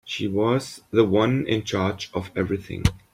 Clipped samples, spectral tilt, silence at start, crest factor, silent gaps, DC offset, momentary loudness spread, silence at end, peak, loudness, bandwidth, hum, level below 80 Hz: under 0.1%; -6 dB/octave; 0.05 s; 20 dB; none; under 0.1%; 8 LU; 0.15 s; -2 dBFS; -24 LUFS; 15.5 kHz; none; -40 dBFS